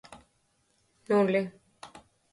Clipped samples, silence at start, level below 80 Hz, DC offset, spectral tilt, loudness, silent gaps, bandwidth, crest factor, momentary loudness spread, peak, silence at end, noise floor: under 0.1%; 0.1 s; -72 dBFS; under 0.1%; -7 dB/octave; -28 LUFS; none; 11.5 kHz; 18 dB; 25 LU; -14 dBFS; 0.35 s; -72 dBFS